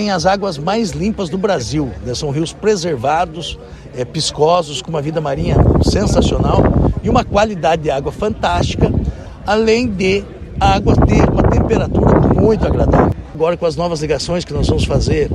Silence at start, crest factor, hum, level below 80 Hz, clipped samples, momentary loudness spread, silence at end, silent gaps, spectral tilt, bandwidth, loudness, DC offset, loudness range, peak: 0 s; 14 dB; none; -24 dBFS; under 0.1%; 8 LU; 0 s; none; -6 dB/octave; 12 kHz; -15 LUFS; under 0.1%; 5 LU; 0 dBFS